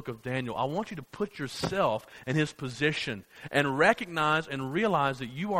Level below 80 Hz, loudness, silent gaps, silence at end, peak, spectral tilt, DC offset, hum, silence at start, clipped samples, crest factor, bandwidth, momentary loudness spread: -60 dBFS; -29 LUFS; none; 0 s; -8 dBFS; -5.5 dB/octave; under 0.1%; none; 0 s; under 0.1%; 22 dB; 16 kHz; 11 LU